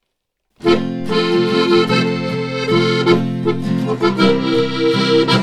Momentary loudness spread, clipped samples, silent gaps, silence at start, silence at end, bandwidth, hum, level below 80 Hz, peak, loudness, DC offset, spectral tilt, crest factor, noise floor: 6 LU; under 0.1%; none; 0.6 s; 0 s; 12 kHz; none; -52 dBFS; 0 dBFS; -16 LUFS; under 0.1%; -6 dB/octave; 14 dB; -73 dBFS